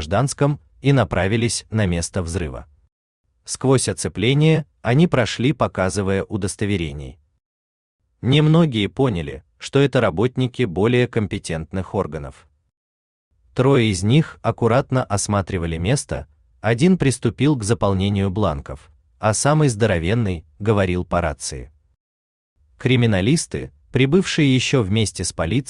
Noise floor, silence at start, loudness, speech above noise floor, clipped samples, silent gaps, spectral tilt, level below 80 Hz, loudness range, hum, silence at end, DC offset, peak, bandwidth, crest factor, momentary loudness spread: under -90 dBFS; 0 s; -20 LUFS; over 71 dB; under 0.1%; 2.92-3.24 s, 7.45-7.99 s, 12.77-13.31 s, 22.00-22.56 s; -5.5 dB/octave; -44 dBFS; 3 LU; none; 0.05 s; under 0.1%; -4 dBFS; 12.5 kHz; 16 dB; 11 LU